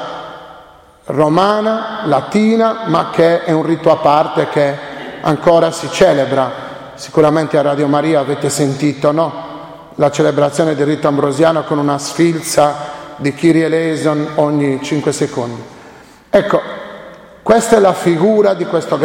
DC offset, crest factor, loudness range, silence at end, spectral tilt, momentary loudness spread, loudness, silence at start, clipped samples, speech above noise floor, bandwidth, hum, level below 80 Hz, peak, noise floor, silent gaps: under 0.1%; 14 dB; 3 LU; 0 s; -5.5 dB/octave; 14 LU; -13 LUFS; 0 s; under 0.1%; 29 dB; 16.5 kHz; none; -50 dBFS; 0 dBFS; -41 dBFS; none